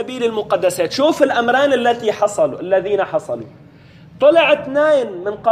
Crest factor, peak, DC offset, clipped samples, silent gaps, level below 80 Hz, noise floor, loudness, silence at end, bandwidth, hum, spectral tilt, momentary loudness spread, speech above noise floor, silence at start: 14 dB; -2 dBFS; under 0.1%; under 0.1%; none; -58 dBFS; -43 dBFS; -16 LUFS; 0 s; 15 kHz; none; -4 dB/octave; 7 LU; 27 dB; 0 s